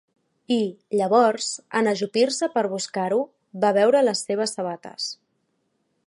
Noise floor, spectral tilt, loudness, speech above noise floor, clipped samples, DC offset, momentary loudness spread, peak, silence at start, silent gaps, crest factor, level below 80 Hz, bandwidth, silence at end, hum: -72 dBFS; -4 dB/octave; -23 LUFS; 50 dB; under 0.1%; under 0.1%; 12 LU; -4 dBFS; 0.5 s; none; 18 dB; -76 dBFS; 11.5 kHz; 0.95 s; none